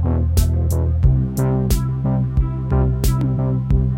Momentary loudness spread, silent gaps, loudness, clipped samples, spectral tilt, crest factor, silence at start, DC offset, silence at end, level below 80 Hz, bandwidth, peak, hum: 3 LU; none; -19 LUFS; under 0.1%; -7.5 dB/octave; 14 dB; 0 s; under 0.1%; 0 s; -22 dBFS; 16.5 kHz; -2 dBFS; none